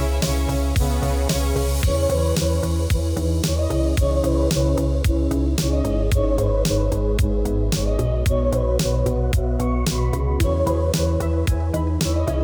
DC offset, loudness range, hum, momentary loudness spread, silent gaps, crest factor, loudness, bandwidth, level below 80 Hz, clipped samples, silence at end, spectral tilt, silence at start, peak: under 0.1%; 1 LU; none; 2 LU; none; 12 dB; -21 LUFS; over 20 kHz; -22 dBFS; under 0.1%; 0 s; -6 dB/octave; 0 s; -6 dBFS